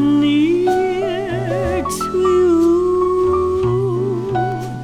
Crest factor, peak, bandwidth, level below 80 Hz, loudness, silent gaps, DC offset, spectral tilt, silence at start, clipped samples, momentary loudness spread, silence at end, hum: 10 dB; -6 dBFS; 14 kHz; -38 dBFS; -17 LUFS; none; under 0.1%; -6.5 dB/octave; 0 s; under 0.1%; 7 LU; 0 s; none